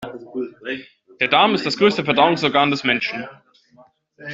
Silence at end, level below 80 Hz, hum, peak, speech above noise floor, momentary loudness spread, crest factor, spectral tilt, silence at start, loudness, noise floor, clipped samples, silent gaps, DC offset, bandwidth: 0 s; -62 dBFS; none; -2 dBFS; 34 dB; 16 LU; 18 dB; -5 dB/octave; 0 s; -18 LUFS; -53 dBFS; under 0.1%; none; under 0.1%; 7.8 kHz